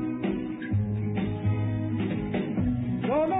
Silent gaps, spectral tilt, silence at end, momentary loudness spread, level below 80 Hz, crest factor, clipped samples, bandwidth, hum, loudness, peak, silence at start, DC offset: none; -7 dB/octave; 0 s; 3 LU; -46 dBFS; 12 dB; under 0.1%; 3.9 kHz; none; -29 LUFS; -16 dBFS; 0 s; under 0.1%